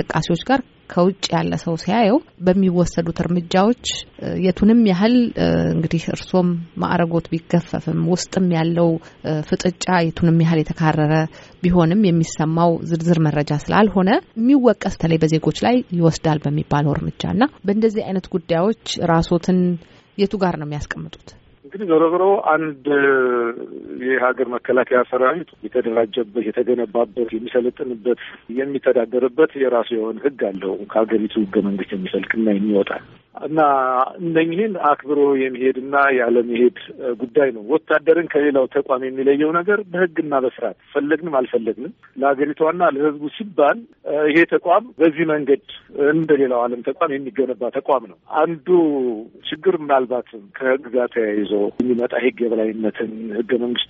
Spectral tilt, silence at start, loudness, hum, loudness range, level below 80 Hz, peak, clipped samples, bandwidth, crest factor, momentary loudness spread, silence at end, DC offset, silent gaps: -5.5 dB/octave; 0 s; -19 LUFS; none; 3 LU; -46 dBFS; -2 dBFS; under 0.1%; 8 kHz; 18 dB; 9 LU; 0.05 s; under 0.1%; none